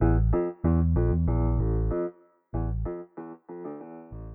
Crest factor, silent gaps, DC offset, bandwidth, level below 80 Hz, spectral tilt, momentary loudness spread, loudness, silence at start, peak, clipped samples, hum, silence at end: 16 dB; none; under 0.1%; 2.7 kHz; -32 dBFS; -14.5 dB/octave; 18 LU; -27 LUFS; 0 s; -10 dBFS; under 0.1%; none; 0 s